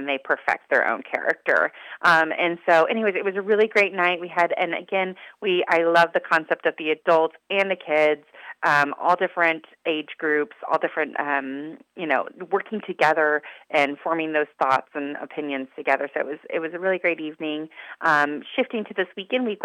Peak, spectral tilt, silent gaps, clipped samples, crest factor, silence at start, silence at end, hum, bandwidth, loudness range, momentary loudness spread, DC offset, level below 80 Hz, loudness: -4 dBFS; -5 dB/octave; none; under 0.1%; 20 dB; 0 s; 0 s; none; 13.5 kHz; 5 LU; 11 LU; under 0.1%; -82 dBFS; -23 LUFS